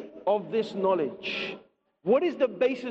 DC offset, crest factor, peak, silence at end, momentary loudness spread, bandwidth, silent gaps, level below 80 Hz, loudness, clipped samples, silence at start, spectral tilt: under 0.1%; 16 dB; -12 dBFS; 0 s; 10 LU; 8 kHz; none; -74 dBFS; -28 LUFS; under 0.1%; 0 s; -6.5 dB/octave